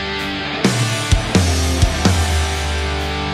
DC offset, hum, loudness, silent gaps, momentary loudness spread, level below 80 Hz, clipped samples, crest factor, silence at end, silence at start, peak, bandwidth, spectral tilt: under 0.1%; none; -17 LUFS; none; 5 LU; -24 dBFS; under 0.1%; 14 dB; 0 s; 0 s; -2 dBFS; 15 kHz; -4.5 dB/octave